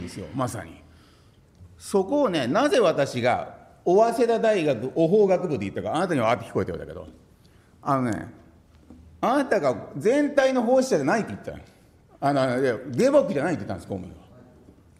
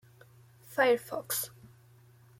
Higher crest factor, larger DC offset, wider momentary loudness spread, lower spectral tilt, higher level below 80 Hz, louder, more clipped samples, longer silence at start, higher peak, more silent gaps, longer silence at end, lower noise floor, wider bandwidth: about the same, 18 dB vs 20 dB; neither; first, 16 LU vs 12 LU; first, -6 dB/octave vs -2.5 dB/octave; first, -58 dBFS vs -74 dBFS; first, -23 LUFS vs -31 LUFS; neither; second, 0 s vs 0.7 s; first, -6 dBFS vs -14 dBFS; neither; about the same, 0.8 s vs 0.9 s; second, -55 dBFS vs -59 dBFS; about the same, 15 kHz vs 16.5 kHz